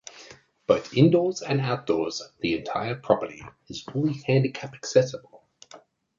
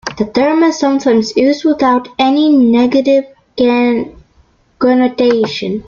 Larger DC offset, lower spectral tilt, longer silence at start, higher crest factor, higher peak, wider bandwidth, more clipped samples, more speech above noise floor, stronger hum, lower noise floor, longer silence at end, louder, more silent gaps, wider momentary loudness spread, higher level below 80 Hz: neither; about the same, -6 dB/octave vs -5 dB/octave; about the same, 0.05 s vs 0.05 s; first, 22 dB vs 10 dB; about the same, -4 dBFS vs -2 dBFS; about the same, 7.6 kHz vs 7.4 kHz; neither; second, 27 dB vs 40 dB; neither; about the same, -52 dBFS vs -51 dBFS; first, 0.4 s vs 0.05 s; second, -25 LUFS vs -12 LUFS; neither; first, 18 LU vs 7 LU; second, -60 dBFS vs -48 dBFS